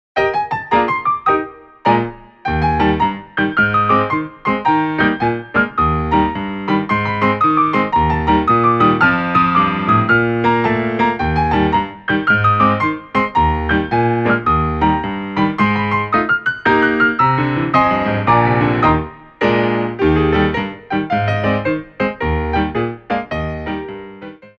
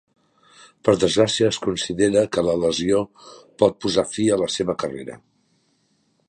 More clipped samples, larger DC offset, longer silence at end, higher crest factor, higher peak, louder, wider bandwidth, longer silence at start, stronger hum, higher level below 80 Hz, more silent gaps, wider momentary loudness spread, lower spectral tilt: neither; neither; second, 0.1 s vs 1.1 s; second, 14 dB vs 20 dB; about the same, 0 dBFS vs -2 dBFS; first, -16 LUFS vs -21 LUFS; second, 7.2 kHz vs 11 kHz; second, 0.15 s vs 0.85 s; neither; first, -32 dBFS vs -52 dBFS; neither; about the same, 8 LU vs 9 LU; first, -8 dB/octave vs -4.5 dB/octave